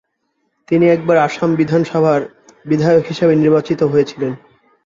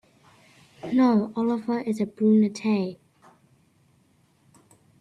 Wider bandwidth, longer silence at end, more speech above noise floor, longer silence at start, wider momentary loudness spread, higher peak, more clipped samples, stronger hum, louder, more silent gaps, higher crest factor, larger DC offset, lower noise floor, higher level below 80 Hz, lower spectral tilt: second, 7.6 kHz vs 11 kHz; second, 0.5 s vs 2.05 s; first, 54 dB vs 41 dB; second, 0.7 s vs 0.85 s; about the same, 8 LU vs 8 LU; first, -2 dBFS vs -10 dBFS; neither; neither; first, -15 LUFS vs -24 LUFS; neither; about the same, 14 dB vs 16 dB; neither; first, -68 dBFS vs -63 dBFS; first, -54 dBFS vs -72 dBFS; about the same, -7.5 dB/octave vs -7.5 dB/octave